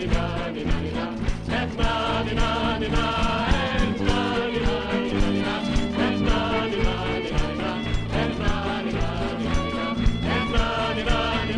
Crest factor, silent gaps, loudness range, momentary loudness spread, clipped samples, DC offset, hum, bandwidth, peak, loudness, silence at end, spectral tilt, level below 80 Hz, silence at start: 16 dB; none; 2 LU; 4 LU; under 0.1%; under 0.1%; none; 10.5 kHz; -8 dBFS; -25 LUFS; 0 s; -6 dB/octave; -28 dBFS; 0 s